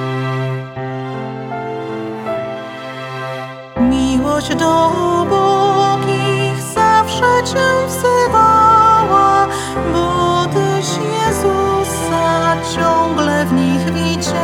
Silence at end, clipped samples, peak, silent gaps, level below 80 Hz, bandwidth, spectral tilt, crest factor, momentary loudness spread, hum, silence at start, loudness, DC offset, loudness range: 0 s; under 0.1%; 0 dBFS; none; -38 dBFS; 17.5 kHz; -5 dB/octave; 14 dB; 13 LU; none; 0 s; -14 LUFS; under 0.1%; 9 LU